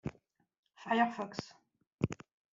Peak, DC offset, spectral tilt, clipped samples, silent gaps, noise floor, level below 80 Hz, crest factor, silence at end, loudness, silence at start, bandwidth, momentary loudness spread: -16 dBFS; under 0.1%; -4.5 dB/octave; under 0.1%; 0.58-0.63 s, 1.87-1.91 s; -70 dBFS; -66 dBFS; 22 dB; 0.4 s; -36 LUFS; 0.05 s; 7.6 kHz; 19 LU